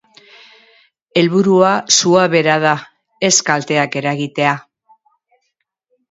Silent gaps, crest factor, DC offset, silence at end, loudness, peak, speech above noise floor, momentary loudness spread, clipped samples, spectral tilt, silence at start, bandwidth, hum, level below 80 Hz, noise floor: none; 16 dB; under 0.1%; 1.55 s; -14 LUFS; 0 dBFS; 57 dB; 9 LU; under 0.1%; -3.5 dB/octave; 1.15 s; 8 kHz; none; -64 dBFS; -71 dBFS